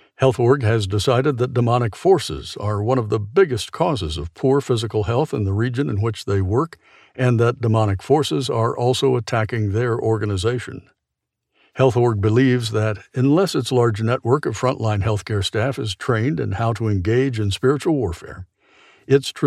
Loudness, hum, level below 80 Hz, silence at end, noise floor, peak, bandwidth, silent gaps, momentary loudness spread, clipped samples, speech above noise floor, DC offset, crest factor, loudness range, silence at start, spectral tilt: -20 LUFS; none; -46 dBFS; 0 s; -80 dBFS; -4 dBFS; 13 kHz; none; 6 LU; under 0.1%; 61 dB; under 0.1%; 16 dB; 2 LU; 0.2 s; -6.5 dB/octave